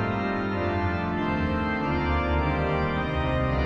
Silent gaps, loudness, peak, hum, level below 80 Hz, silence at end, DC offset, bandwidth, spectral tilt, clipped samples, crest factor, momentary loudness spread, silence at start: none; -26 LUFS; -12 dBFS; none; -34 dBFS; 0 s; under 0.1%; 6.6 kHz; -8.5 dB/octave; under 0.1%; 12 dB; 2 LU; 0 s